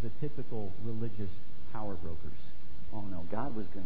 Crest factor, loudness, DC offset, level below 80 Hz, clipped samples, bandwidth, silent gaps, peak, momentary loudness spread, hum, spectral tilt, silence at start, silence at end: 20 dB; -42 LUFS; 7%; -54 dBFS; under 0.1%; 5 kHz; none; -18 dBFS; 13 LU; none; -10 dB/octave; 0 s; 0 s